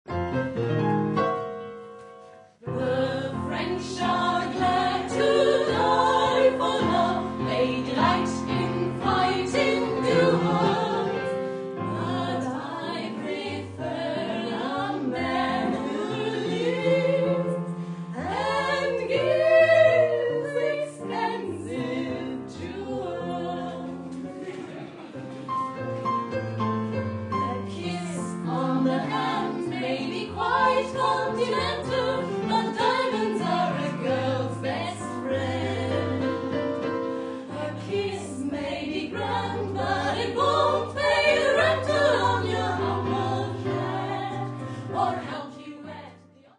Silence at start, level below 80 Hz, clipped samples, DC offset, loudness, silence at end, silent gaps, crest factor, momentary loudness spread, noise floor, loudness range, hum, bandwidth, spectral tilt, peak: 0.05 s; -60 dBFS; under 0.1%; under 0.1%; -26 LUFS; 0.4 s; none; 18 dB; 12 LU; -51 dBFS; 8 LU; none; 11 kHz; -6 dB/octave; -8 dBFS